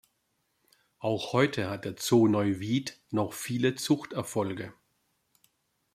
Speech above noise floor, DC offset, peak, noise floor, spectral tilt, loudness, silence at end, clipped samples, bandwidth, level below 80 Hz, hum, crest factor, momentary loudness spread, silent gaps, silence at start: 48 dB; under 0.1%; -10 dBFS; -76 dBFS; -5.5 dB/octave; -29 LUFS; 1.25 s; under 0.1%; 15.5 kHz; -70 dBFS; none; 20 dB; 11 LU; none; 1 s